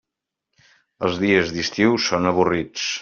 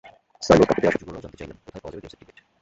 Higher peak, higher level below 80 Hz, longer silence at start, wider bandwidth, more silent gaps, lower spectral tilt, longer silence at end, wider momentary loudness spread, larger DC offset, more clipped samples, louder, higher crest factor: about the same, -2 dBFS vs -2 dBFS; second, -56 dBFS vs -48 dBFS; first, 1 s vs 0.4 s; second, 7.2 kHz vs 8 kHz; neither; second, -3.5 dB/octave vs -6 dB/octave; second, 0 s vs 0.55 s; second, 7 LU vs 23 LU; neither; neither; about the same, -20 LUFS vs -19 LUFS; about the same, 18 dB vs 22 dB